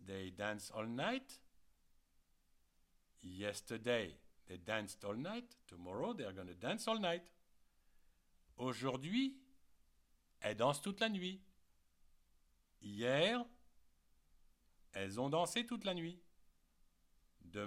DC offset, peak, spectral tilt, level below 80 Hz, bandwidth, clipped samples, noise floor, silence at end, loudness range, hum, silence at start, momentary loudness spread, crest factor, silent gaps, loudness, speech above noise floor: under 0.1%; -22 dBFS; -4.5 dB/octave; -74 dBFS; 16 kHz; under 0.1%; -75 dBFS; 0 s; 6 LU; none; 0 s; 16 LU; 22 dB; none; -42 LUFS; 33 dB